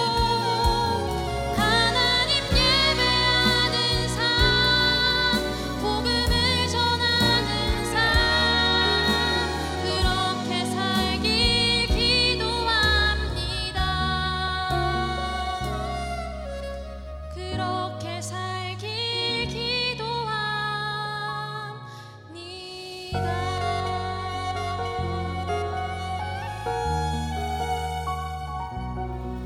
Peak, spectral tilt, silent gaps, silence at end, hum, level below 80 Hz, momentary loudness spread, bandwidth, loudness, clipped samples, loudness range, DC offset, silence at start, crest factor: -6 dBFS; -4 dB/octave; none; 0 s; none; -34 dBFS; 13 LU; 16.5 kHz; -23 LUFS; under 0.1%; 10 LU; under 0.1%; 0 s; 18 dB